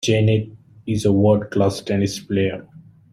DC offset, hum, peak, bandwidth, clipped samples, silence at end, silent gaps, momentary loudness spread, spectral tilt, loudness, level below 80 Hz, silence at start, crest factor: under 0.1%; none; -4 dBFS; 13.5 kHz; under 0.1%; 0.35 s; none; 14 LU; -6.5 dB/octave; -20 LUFS; -52 dBFS; 0 s; 16 dB